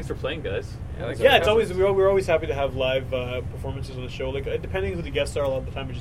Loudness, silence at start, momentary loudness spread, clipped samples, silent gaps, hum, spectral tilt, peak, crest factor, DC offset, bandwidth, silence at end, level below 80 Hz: -24 LUFS; 0 s; 14 LU; under 0.1%; none; none; -5.5 dB/octave; -4 dBFS; 20 dB; under 0.1%; 15 kHz; 0 s; -38 dBFS